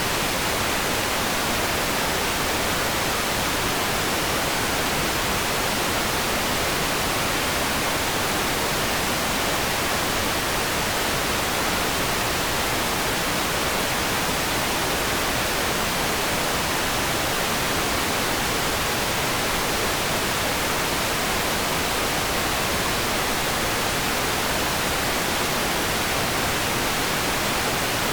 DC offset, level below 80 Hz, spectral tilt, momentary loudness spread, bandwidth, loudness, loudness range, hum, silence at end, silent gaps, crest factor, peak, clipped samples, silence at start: under 0.1%; -40 dBFS; -2.5 dB/octave; 0 LU; over 20 kHz; -22 LUFS; 0 LU; none; 0 s; none; 12 dB; -12 dBFS; under 0.1%; 0 s